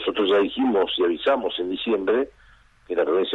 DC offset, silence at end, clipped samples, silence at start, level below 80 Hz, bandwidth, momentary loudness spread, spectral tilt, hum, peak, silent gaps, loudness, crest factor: under 0.1%; 0 s; under 0.1%; 0 s; -56 dBFS; 4.2 kHz; 6 LU; -6 dB/octave; none; -10 dBFS; none; -23 LUFS; 14 dB